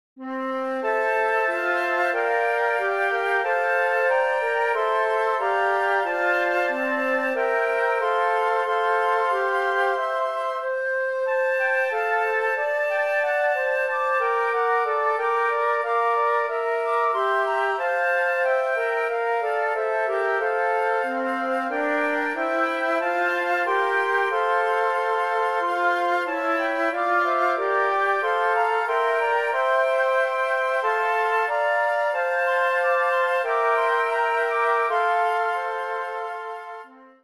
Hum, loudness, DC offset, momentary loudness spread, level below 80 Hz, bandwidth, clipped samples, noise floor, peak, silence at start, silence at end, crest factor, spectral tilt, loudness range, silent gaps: none; -22 LUFS; under 0.1%; 3 LU; -76 dBFS; 13.5 kHz; under 0.1%; -43 dBFS; -10 dBFS; 0.15 s; 0.2 s; 12 dB; -1.5 dB/octave; 2 LU; none